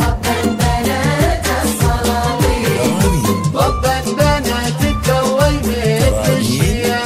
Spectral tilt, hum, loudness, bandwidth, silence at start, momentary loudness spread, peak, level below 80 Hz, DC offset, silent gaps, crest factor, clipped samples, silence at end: -5 dB/octave; none; -15 LUFS; 16 kHz; 0 s; 2 LU; 0 dBFS; -22 dBFS; under 0.1%; none; 14 dB; under 0.1%; 0 s